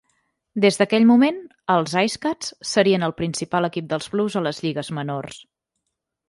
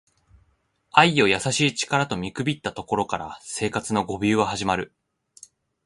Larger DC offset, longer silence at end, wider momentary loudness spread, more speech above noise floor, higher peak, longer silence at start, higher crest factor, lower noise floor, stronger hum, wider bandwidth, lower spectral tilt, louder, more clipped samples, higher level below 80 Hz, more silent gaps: neither; about the same, 0.9 s vs 1 s; about the same, 12 LU vs 11 LU; first, 59 dB vs 44 dB; about the same, -4 dBFS vs -2 dBFS; second, 0.55 s vs 0.95 s; second, 18 dB vs 24 dB; first, -79 dBFS vs -67 dBFS; neither; about the same, 11.5 kHz vs 11.5 kHz; about the same, -5 dB/octave vs -4 dB/octave; about the same, -21 LUFS vs -23 LUFS; neither; second, -60 dBFS vs -54 dBFS; neither